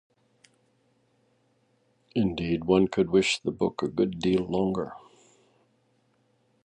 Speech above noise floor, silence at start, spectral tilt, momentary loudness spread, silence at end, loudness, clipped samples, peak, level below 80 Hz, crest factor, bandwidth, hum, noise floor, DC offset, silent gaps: 43 dB; 2.15 s; -5.5 dB/octave; 10 LU; 1.65 s; -26 LUFS; under 0.1%; -8 dBFS; -56 dBFS; 22 dB; 10 kHz; none; -69 dBFS; under 0.1%; none